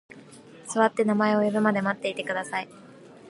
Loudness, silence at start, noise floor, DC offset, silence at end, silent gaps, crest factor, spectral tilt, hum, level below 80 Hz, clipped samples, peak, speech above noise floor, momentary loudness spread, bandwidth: -25 LUFS; 0.15 s; -48 dBFS; under 0.1%; 0 s; none; 20 dB; -5.5 dB/octave; none; -74 dBFS; under 0.1%; -6 dBFS; 23 dB; 10 LU; 11.5 kHz